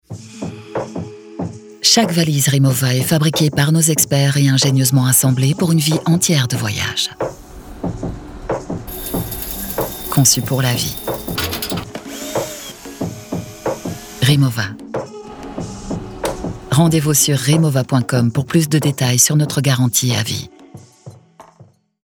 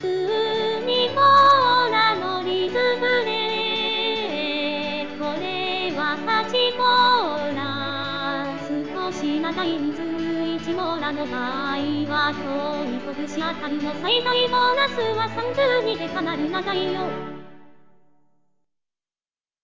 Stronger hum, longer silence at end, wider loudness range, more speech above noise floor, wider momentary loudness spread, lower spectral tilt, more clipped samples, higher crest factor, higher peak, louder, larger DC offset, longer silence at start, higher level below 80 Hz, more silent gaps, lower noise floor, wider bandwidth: neither; first, 0.45 s vs 0 s; about the same, 8 LU vs 7 LU; second, 33 dB vs over 66 dB; first, 16 LU vs 10 LU; about the same, -4 dB/octave vs -4.5 dB/octave; neither; about the same, 16 dB vs 16 dB; first, -2 dBFS vs -6 dBFS; first, -16 LUFS vs -22 LUFS; second, under 0.1% vs 0.8%; about the same, 0.1 s vs 0 s; first, -42 dBFS vs -58 dBFS; neither; second, -48 dBFS vs under -90 dBFS; first, over 20 kHz vs 7.6 kHz